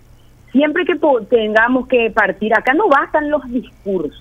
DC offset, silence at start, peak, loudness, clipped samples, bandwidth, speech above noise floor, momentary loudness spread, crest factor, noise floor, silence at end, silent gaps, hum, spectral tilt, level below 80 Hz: under 0.1%; 0.55 s; 0 dBFS; -15 LUFS; under 0.1%; 9 kHz; 29 dB; 9 LU; 16 dB; -44 dBFS; 0 s; none; none; -6.5 dB/octave; -46 dBFS